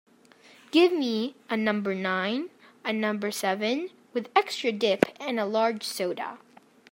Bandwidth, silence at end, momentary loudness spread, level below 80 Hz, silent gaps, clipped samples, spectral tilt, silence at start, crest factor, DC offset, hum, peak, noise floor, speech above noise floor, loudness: 16 kHz; 0.55 s; 10 LU; -76 dBFS; none; under 0.1%; -4.5 dB/octave; 0.75 s; 26 dB; under 0.1%; none; -2 dBFS; -56 dBFS; 29 dB; -27 LUFS